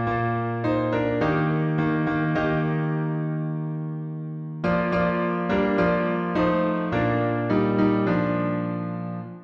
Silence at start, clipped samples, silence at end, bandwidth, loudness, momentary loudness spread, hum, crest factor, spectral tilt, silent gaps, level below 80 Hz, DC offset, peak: 0 s; under 0.1%; 0 s; 6.6 kHz; -24 LUFS; 9 LU; none; 14 dB; -9.5 dB/octave; none; -48 dBFS; under 0.1%; -8 dBFS